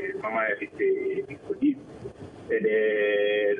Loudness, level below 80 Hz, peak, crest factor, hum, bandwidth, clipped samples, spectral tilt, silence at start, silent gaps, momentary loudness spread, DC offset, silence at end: -26 LUFS; -66 dBFS; -14 dBFS; 12 dB; none; 5 kHz; under 0.1%; -7 dB/octave; 0 s; none; 18 LU; under 0.1%; 0 s